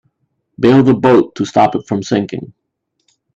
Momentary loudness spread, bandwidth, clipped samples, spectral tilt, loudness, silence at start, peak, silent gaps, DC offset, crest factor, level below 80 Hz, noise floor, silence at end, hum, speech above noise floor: 10 LU; 7.8 kHz; under 0.1%; -7 dB/octave; -13 LUFS; 0.6 s; 0 dBFS; none; under 0.1%; 14 dB; -52 dBFS; -67 dBFS; 0.9 s; none; 55 dB